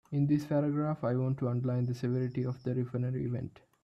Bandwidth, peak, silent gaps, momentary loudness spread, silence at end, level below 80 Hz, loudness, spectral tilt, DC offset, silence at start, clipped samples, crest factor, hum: 7.2 kHz; -18 dBFS; none; 6 LU; 0.35 s; -66 dBFS; -33 LUFS; -9.5 dB/octave; under 0.1%; 0.1 s; under 0.1%; 14 dB; none